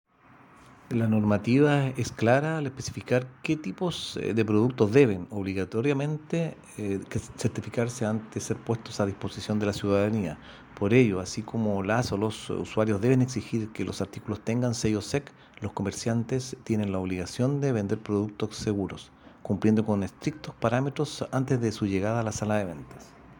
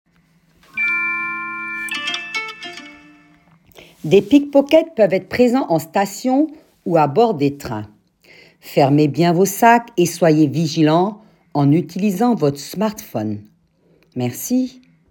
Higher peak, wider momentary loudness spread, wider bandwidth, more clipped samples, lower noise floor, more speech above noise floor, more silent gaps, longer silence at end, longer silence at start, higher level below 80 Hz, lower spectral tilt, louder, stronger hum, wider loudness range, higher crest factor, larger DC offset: second, -6 dBFS vs 0 dBFS; second, 10 LU vs 14 LU; about the same, 17 kHz vs 18 kHz; neither; about the same, -56 dBFS vs -57 dBFS; second, 28 dB vs 41 dB; neither; second, 0.05 s vs 0.4 s; first, 0.9 s vs 0.75 s; about the same, -56 dBFS vs -58 dBFS; about the same, -6.5 dB/octave vs -6 dB/octave; second, -28 LUFS vs -17 LUFS; neither; second, 4 LU vs 7 LU; about the same, 22 dB vs 18 dB; neither